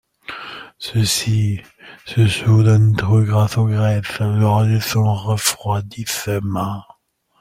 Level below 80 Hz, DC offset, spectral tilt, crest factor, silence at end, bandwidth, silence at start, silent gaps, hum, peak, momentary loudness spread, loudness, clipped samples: -48 dBFS; under 0.1%; -5.5 dB/octave; 16 dB; 0.6 s; 16 kHz; 0.3 s; none; none; -2 dBFS; 16 LU; -17 LUFS; under 0.1%